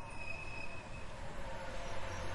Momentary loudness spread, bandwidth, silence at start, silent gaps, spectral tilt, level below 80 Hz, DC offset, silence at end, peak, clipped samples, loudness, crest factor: 5 LU; 11.5 kHz; 0 s; none; -4.5 dB/octave; -50 dBFS; under 0.1%; 0 s; -28 dBFS; under 0.1%; -46 LUFS; 12 dB